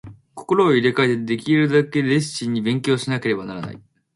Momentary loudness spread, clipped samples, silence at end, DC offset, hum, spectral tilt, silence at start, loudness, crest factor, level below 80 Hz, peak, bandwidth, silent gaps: 15 LU; under 0.1%; 0.4 s; under 0.1%; none; -6 dB/octave; 0.05 s; -19 LUFS; 18 dB; -60 dBFS; -2 dBFS; 11.5 kHz; none